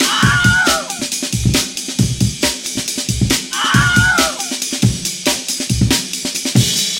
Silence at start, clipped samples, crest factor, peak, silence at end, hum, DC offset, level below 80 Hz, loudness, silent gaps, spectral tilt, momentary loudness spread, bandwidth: 0 s; under 0.1%; 16 dB; 0 dBFS; 0 s; none; under 0.1%; -32 dBFS; -15 LUFS; none; -3 dB/octave; 8 LU; 17 kHz